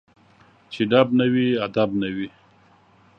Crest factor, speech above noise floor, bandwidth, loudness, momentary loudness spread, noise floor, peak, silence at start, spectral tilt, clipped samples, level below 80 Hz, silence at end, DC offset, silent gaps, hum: 22 dB; 35 dB; 6 kHz; -21 LUFS; 15 LU; -55 dBFS; -2 dBFS; 0.7 s; -8 dB/octave; under 0.1%; -60 dBFS; 0.9 s; under 0.1%; none; none